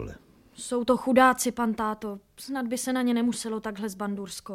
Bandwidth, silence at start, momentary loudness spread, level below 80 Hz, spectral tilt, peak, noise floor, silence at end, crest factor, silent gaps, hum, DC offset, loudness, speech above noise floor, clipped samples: 16 kHz; 0 s; 16 LU; -56 dBFS; -4 dB/octave; -8 dBFS; -47 dBFS; 0 s; 20 dB; none; none; under 0.1%; -27 LUFS; 20 dB; under 0.1%